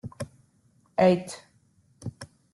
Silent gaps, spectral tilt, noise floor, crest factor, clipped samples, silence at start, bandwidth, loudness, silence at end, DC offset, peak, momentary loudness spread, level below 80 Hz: none; -6.5 dB/octave; -64 dBFS; 20 dB; under 0.1%; 0.05 s; 12 kHz; -24 LUFS; 0.3 s; under 0.1%; -10 dBFS; 21 LU; -66 dBFS